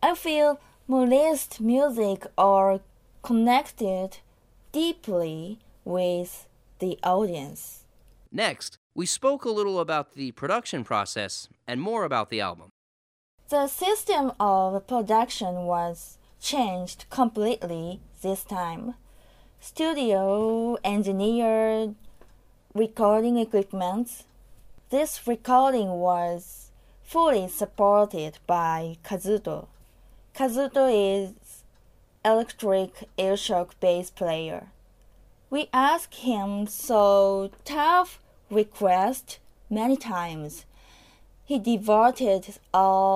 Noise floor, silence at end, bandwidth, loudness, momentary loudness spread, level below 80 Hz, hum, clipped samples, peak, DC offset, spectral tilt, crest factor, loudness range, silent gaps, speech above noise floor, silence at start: -57 dBFS; 0 s; 15.5 kHz; -25 LUFS; 14 LU; -56 dBFS; none; under 0.1%; -8 dBFS; under 0.1%; -4.5 dB/octave; 18 dB; 6 LU; 8.78-8.90 s, 12.71-13.38 s; 33 dB; 0 s